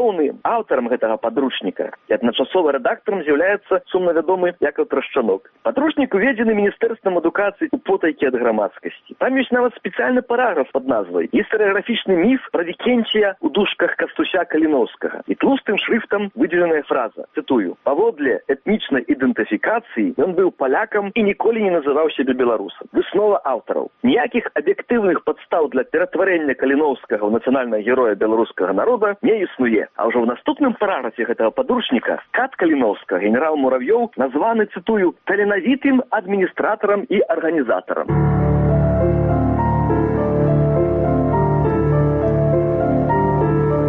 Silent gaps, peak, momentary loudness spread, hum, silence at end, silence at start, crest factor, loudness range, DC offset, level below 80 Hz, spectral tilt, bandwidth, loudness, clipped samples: none; -6 dBFS; 4 LU; none; 0 s; 0 s; 12 dB; 2 LU; under 0.1%; -38 dBFS; -5.5 dB/octave; 3.9 kHz; -18 LUFS; under 0.1%